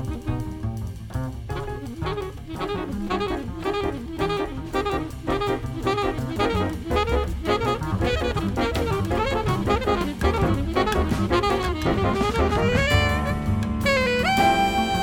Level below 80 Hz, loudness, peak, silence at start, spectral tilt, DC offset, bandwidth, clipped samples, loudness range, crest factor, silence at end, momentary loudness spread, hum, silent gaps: -32 dBFS; -24 LUFS; -6 dBFS; 0 s; -6 dB/octave; under 0.1%; 18 kHz; under 0.1%; 7 LU; 16 dB; 0 s; 10 LU; none; none